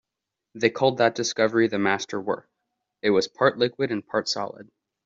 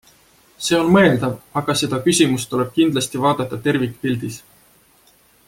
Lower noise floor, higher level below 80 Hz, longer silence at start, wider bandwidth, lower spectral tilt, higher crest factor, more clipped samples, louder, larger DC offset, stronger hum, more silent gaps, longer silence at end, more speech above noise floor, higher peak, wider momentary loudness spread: first, -85 dBFS vs -54 dBFS; second, -68 dBFS vs -54 dBFS; about the same, 0.55 s vs 0.6 s; second, 7.8 kHz vs 16.5 kHz; about the same, -4 dB/octave vs -4.5 dB/octave; about the same, 20 dB vs 18 dB; neither; second, -24 LUFS vs -18 LUFS; neither; neither; neither; second, 0.45 s vs 1.1 s; first, 62 dB vs 36 dB; second, -6 dBFS vs -2 dBFS; about the same, 8 LU vs 10 LU